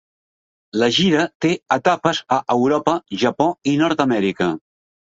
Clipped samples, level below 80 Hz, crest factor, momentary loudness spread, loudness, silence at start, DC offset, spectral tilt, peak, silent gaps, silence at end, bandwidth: under 0.1%; -58 dBFS; 18 dB; 5 LU; -18 LUFS; 0.75 s; under 0.1%; -5 dB/octave; -2 dBFS; 1.35-1.40 s; 0.5 s; 8 kHz